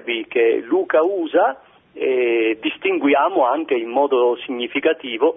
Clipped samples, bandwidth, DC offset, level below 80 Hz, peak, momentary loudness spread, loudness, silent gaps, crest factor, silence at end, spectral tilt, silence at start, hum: under 0.1%; 3.8 kHz; under 0.1%; -70 dBFS; -4 dBFS; 5 LU; -19 LUFS; none; 14 dB; 0 s; -7.5 dB/octave; 0.05 s; none